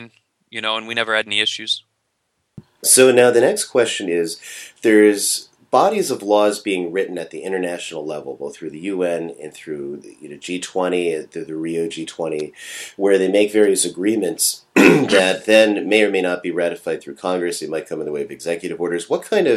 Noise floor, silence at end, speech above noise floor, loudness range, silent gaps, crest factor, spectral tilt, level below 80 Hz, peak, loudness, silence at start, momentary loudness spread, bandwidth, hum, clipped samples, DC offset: -71 dBFS; 0 s; 53 dB; 10 LU; none; 18 dB; -3 dB/octave; -66 dBFS; 0 dBFS; -18 LUFS; 0 s; 16 LU; 14.5 kHz; none; under 0.1%; under 0.1%